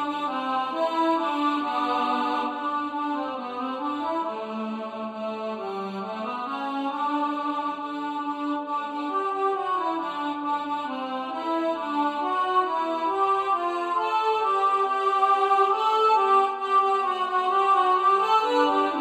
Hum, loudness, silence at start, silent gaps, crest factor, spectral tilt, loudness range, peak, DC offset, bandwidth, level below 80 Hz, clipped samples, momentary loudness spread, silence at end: none; -25 LUFS; 0 s; none; 16 dB; -4.5 dB/octave; 9 LU; -8 dBFS; under 0.1%; 11.5 kHz; -76 dBFS; under 0.1%; 11 LU; 0 s